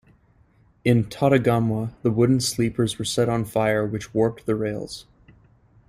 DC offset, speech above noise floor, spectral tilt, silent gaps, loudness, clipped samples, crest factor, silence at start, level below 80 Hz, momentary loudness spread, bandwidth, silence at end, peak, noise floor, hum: under 0.1%; 36 dB; -6 dB/octave; none; -22 LUFS; under 0.1%; 18 dB; 0.85 s; -52 dBFS; 7 LU; 15.5 kHz; 0.85 s; -6 dBFS; -58 dBFS; none